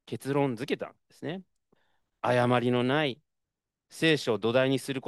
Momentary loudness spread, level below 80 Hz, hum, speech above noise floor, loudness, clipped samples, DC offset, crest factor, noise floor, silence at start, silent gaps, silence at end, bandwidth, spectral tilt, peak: 15 LU; -74 dBFS; none; 59 dB; -28 LUFS; under 0.1%; under 0.1%; 20 dB; -87 dBFS; 0.1 s; none; 0.05 s; 12.5 kHz; -6 dB/octave; -10 dBFS